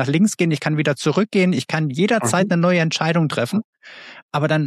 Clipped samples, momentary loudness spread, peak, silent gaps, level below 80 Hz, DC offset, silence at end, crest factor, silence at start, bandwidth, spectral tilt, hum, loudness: under 0.1%; 9 LU; -4 dBFS; 3.64-3.73 s, 4.23-4.29 s; -66 dBFS; under 0.1%; 0 s; 14 dB; 0 s; 13.5 kHz; -5.5 dB/octave; none; -19 LUFS